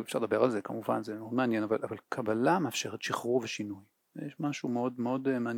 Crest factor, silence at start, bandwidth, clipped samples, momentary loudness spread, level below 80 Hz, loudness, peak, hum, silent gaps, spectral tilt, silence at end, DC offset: 20 dB; 0 s; 18 kHz; under 0.1%; 10 LU; -82 dBFS; -32 LUFS; -12 dBFS; none; none; -5 dB/octave; 0 s; under 0.1%